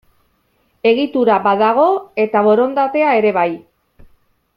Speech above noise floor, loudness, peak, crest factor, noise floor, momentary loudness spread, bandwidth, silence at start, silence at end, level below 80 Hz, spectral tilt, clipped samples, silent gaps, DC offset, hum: 47 dB; -14 LUFS; -2 dBFS; 14 dB; -61 dBFS; 6 LU; 5.4 kHz; 0.85 s; 1 s; -58 dBFS; -8 dB/octave; under 0.1%; none; under 0.1%; none